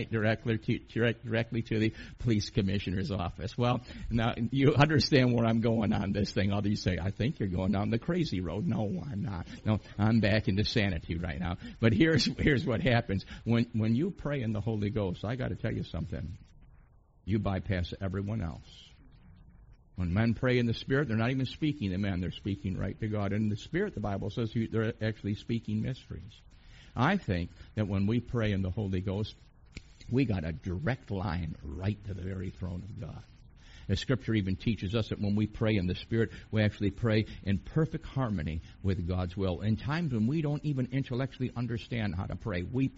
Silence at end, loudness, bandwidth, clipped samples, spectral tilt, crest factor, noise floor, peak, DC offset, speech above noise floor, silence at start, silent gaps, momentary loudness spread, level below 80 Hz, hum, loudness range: 0 s; -31 LUFS; 7.6 kHz; under 0.1%; -6 dB/octave; 24 dB; -60 dBFS; -6 dBFS; under 0.1%; 29 dB; 0 s; none; 9 LU; -48 dBFS; none; 7 LU